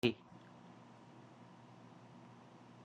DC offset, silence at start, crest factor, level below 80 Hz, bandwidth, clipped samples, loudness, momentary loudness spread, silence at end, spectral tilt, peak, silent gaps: under 0.1%; 0.05 s; 30 dB; -76 dBFS; 10 kHz; under 0.1%; -51 LUFS; 5 LU; 0 s; -6 dB/octave; -16 dBFS; none